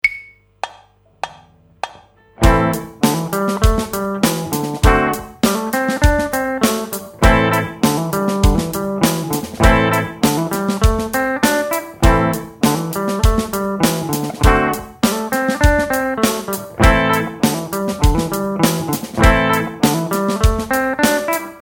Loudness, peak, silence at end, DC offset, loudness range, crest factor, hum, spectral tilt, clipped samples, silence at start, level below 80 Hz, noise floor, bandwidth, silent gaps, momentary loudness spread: -17 LUFS; 0 dBFS; 0.05 s; under 0.1%; 2 LU; 16 dB; none; -5 dB/octave; under 0.1%; 0.05 s; -22 dBFS; -49 dBFS; 18.5 kHz; none; 8 LU